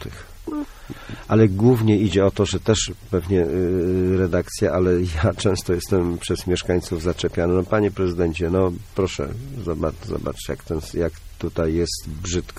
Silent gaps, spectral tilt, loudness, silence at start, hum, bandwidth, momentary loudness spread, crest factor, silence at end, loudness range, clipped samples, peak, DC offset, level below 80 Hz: none; -6 dB/octave; -22 LUFS; 0 s; none; 15.5 kHz; 13 LU; 18 dB; 0 s; 6 LU; under 0.1%; -4 dBFS; under 0.1%; -38 dBFS